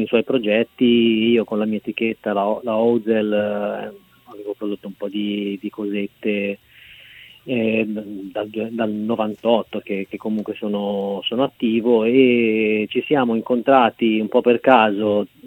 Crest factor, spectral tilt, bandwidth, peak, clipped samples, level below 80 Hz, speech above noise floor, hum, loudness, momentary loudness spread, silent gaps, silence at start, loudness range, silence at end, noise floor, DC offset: 20 dB; -7.5 dB/octave; 4.1 kHz; 0 dBFS; under 0.1%; -64 dBFS; 26 dB; none; -20 LUFS; 12 LU; none; 0 s; 9 LU; 0 s; -45 dBFS; under 0.1%